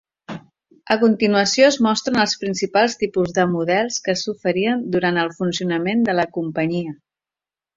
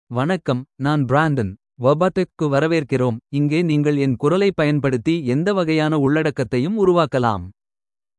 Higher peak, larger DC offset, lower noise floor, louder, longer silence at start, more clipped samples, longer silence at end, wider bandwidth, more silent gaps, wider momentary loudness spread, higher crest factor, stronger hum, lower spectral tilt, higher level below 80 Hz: about the same, 0 dBFS vs -2 dBFS; neither; about the same, -90 dBFS vs under -90 dBFS; about the same, -19 LUFS vs -19 LUFS; first, 0.3 s vs 0.1 s; neither; first, 0.8 s vs 0.65 s; second, 7.8 kHz vs 11 kHz; neither; first, 8 LU vs 5 LU; about the same, 20 dB vs 16 dB; neither; second, -4.5 dB/octave vs -7.5 dB/octave; about the same, -58 dBFS vs -54 dBFS